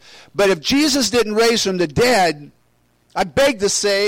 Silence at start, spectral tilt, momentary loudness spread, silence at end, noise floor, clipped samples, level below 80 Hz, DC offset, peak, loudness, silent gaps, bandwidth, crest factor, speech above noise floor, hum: 0.35 s; -3 dB/octave; 8 LU; 0 s; -60 dBFS; under 0.1%; -46 dBFS; under 0.1%; -8 dBFS; -16 LUFS; none; 16.5 kHz; 10 dB; 44 dB; none